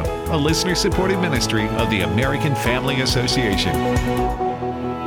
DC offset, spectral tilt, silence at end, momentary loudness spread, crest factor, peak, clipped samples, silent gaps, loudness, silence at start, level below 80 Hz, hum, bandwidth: under 0.1%; -4.5 dB/octave; 0 s; 4 LU; 14 dB; -6 dBFS; under 0.1%; none; -19 LUFS; 0 s; -32 dBFS; none; 20 kHz